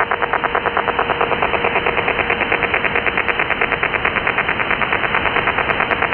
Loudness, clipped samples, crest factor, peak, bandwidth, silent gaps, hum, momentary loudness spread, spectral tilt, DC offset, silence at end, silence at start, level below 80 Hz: -16 LUFS; under 0.1%; 18 dB; 0 dBFS; 5.4 kHz; none; none; 2 LU; -7.5 dB/octave; under 0.1%; 0 s; 0 s; -40 dBFS